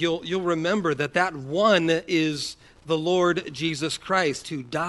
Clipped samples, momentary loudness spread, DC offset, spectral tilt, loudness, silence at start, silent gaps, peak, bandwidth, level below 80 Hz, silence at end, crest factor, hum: under 0.1%; 9 LU; under 0.1%; -4.5 dB/octave; -24 LUFS; 0 s; none; -6 dBFS; 11.5 kHz; -60 dBFS; 0 s; 18 dB; none